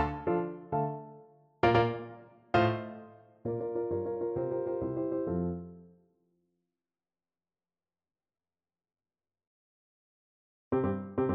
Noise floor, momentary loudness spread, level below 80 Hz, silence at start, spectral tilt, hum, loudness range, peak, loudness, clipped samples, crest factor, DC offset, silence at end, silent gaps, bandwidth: under -90 dBFS; 16 LU; -58 dBFS; 0 s; -9 dB/octave; none; 9 LU; -10 dBFS; -32 LUFS; under 0.1%; 24 dB; under 0.1%; 0 s; 9.47-10.71 s; 6.6 kHz